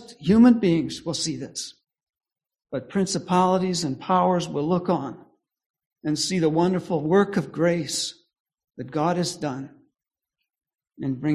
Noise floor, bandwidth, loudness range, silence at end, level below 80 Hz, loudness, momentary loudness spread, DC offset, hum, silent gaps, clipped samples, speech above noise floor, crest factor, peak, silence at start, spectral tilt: -87 dBFS; 13.5 kHz; 4 LU; 0 s; -58 dBFS; -23 LUFS; 13 LU; under 0.1%; none; 5.66-5.74 s, 8.40-8.45 s; under 0.1%; 64 dB; 18 dB; -6 dBFS; 0 s; -5.5 dB/octave